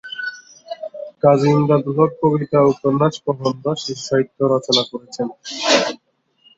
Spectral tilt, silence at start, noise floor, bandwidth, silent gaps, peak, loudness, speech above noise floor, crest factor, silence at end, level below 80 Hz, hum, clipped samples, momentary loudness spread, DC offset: -5 dB/octave; 0.05 s; -60 dBFS; 8 kHz; none; -2 dBFS; -18 LUFS; 43 dB; 18 dB; 0.65 s; -58 dBFS; none; under 0.1%; 15 LU; under 0.1%